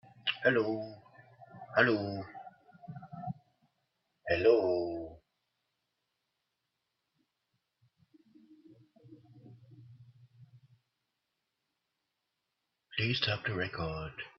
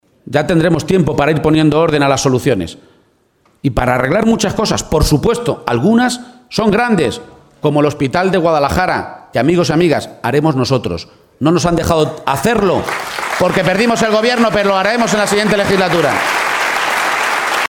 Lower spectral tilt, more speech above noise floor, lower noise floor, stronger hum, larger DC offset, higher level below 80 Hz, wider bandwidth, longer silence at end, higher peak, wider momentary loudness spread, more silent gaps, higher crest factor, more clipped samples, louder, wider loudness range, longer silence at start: second, -3.5 dB/octave vs -5 dB/octave; first, 54 dB vs 42 dB; first, -85 dBFS vs -55 dBFS; neither; neither; second, -66 dBFS vs -34 dBFS; second, 6.2 kHz vs 18 kHz; about the same, 0.1 s vs 0 s; second, -10 dBFS vs 0 dBFS; first, 22 LU vs 6 LU; neither; first, 28 dB vs 14 dB; neither; second, -32 LUFS vs -14 LUFS; first, 8 LU vs 2 LU; about the same, 0.25 s vs 0.25 s